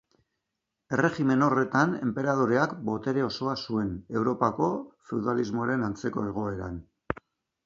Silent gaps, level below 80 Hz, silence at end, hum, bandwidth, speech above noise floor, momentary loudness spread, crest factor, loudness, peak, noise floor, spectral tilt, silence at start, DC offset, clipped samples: none; -56 dBFS; 0.55 s; none; 7.4 kHz; 57 dB; 12 LU; 20 dB; -28 LUFS; -8 dBFS; -84 dBFS; -7 dB/octave; 0.9 s; under 0.1%; under 0.1%